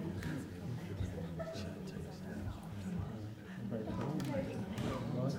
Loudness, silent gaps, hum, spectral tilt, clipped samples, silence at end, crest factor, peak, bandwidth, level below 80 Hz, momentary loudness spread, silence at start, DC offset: -42 LUFS; none; none; -7 dB/octave; under 0.1%; 0 s; 16 dB; -26 dBFS; 16 kHz; -58 dBFS; 7 LU; 0 s; under 0.1%